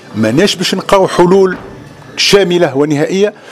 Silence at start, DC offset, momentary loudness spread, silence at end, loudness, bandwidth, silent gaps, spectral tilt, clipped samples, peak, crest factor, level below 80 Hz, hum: 0.05 s; under 0.1%; 6 LU; 0 s; -10 LUFS; 15 kHz; none; -4.5 dB/octave; 0.3%; 0 dBFS; 10 dB; -40 dBFS; none